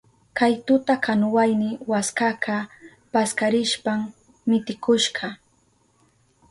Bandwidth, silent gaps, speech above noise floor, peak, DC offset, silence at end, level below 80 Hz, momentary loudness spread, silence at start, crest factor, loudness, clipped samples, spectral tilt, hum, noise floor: 11.5 kHz; none; 41 dB; -8 dBFS; under 0.1%; 1.15 s; -66 dBFS; 10 LU; 0.35 s; 16 dB; -22 LUFS; under 0.1%; -4 dB/octave; none; -63 dBFS